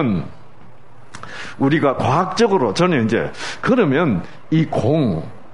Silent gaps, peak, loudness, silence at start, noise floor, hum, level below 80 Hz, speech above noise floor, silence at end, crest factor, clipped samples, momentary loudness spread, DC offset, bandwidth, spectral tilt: none; -2 dBFS; -18 LUFS; 0 s; -46 dBFS; none; -50 dBFS; 29 dB; 0.15 s; 16 dB; under 0.1%; 14 LU; 2%; 11 kHz; -6.5 dB/octave